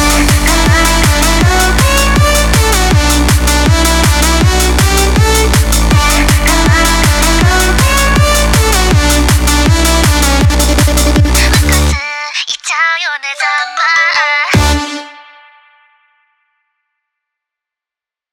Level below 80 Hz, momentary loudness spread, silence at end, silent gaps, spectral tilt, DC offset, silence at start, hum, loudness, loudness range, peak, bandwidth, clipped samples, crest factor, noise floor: -14 dBFS; 4 LU; 3.1 s; none; -3.5 dB/octave; under 0.1%; 0 s; none; -9 LUFS; 4 LU; 0 dBFS; 19.5 kHz; under 0.1%; 10 dB; -87 dBFS